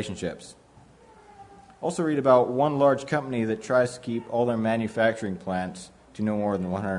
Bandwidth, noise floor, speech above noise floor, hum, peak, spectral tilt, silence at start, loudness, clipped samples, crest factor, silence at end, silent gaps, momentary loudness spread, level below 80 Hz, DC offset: 11 kHz; -53 dBFS; 28 dB; none; -6 dBFS; -6.5 dB/octave; 0 s; -25 LUFS; under 0.1%; 20 dB; 0 s; none; 13 LU; -64 dBFS; under 0.1%